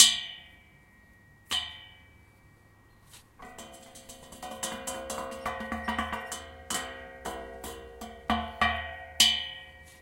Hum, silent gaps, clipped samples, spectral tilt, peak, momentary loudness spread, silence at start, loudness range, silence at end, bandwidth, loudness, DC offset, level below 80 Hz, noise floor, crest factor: none; none; under 0.1%; -0.5 dB/octave; -2 dBFS; 25 LU; 0 s; 11 LU; 0 s; 16.5 kHz; -30 LUFS; under 0.1%; -54 dBFS; -59 dBFS; 32 dB